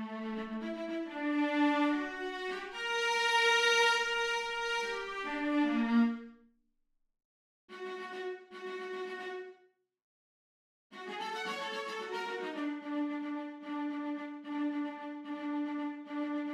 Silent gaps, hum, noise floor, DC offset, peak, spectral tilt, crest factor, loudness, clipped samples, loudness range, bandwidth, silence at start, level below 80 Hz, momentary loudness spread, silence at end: 7.25-7.68 s, 10.02-10.90 s; none; -77 dBFS; under 0.1%; -16 dBFS; -2.5 dB/octave; 18 dB; -34 LUFS; under 0.1%; 14 LU; 14.5 kHz; 0 s; -70 dBFS; 15 LU; 0 s